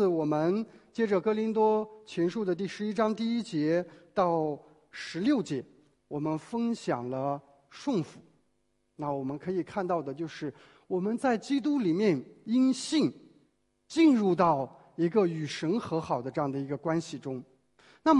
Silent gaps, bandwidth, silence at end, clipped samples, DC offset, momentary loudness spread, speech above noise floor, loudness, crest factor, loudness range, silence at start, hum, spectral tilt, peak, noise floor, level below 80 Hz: none; 11 kHz; 0 s; under 0.1%; under 0.1%; 12 LU; 46 dB; -30 LUFS; 20 dB; 7 LU; 0 s; none; -6.5 dB/octave; -10 dBFS; -75 dBFS; -70 dBFS